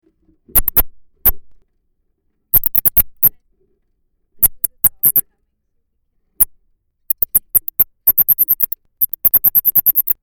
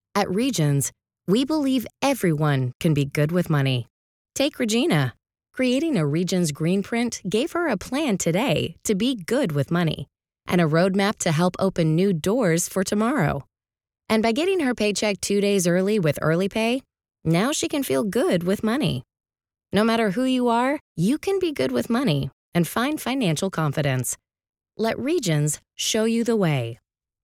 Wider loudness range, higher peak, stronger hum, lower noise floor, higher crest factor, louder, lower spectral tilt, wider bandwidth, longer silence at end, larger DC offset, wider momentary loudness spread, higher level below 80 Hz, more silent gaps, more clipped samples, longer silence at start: about the same, 4 LU vs 2 LU; first, 0 dBFS vs -6 dBFS; neither; second, -66 dBFS vs under -90 dBFS; about the same, 18 dB vs 16 dB; first, -12 LUFS vs -23 LUFS; second, -2 dB/octave vs -5 dB/octave; first, over 20 kHz vs 17.5 kHz; second, 0.1 s vs 0.5 s; neither; about the same, 6 LU vs 6 LU; first, -34 dBFS vs -56 dBFS; second, none vs 2.75-2.80 s, 3.90-4.25 s, 20.81-20.95 s, 22.33-22.52 s; neither; first, 0.55 s vs 0.15 s